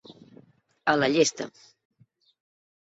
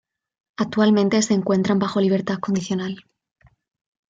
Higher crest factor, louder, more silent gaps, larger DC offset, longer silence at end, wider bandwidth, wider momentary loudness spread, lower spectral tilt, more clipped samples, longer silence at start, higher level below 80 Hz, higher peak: first, 22 dB vs 16 dB; second, -24 LUFS vs -21 LUFS; neither; neither; first, 1.5 s vs 1.1 s; second, 8 kHz vs 9.4 kHz; first, 17 LU vs 11 LU; second, -3.5 dB/octave vs -5.5 dB/octave; neither; first, 0.85 s vs 0.6 s; second, -70 dBFS vs -62 dBFS; about the same, -8 dBFS vs -6 dBFS